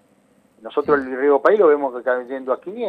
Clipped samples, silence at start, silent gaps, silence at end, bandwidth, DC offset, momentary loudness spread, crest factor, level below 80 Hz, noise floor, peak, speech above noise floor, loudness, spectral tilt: under 0.1%; 0.65 s; none; 0 s; 4.8 kHz; under 0.1%; 11 LU; 16 dB; -62 dBFS; -57 dBFS; -2 dBFS; 39 dB; -19 LUFS; -7 dB/octave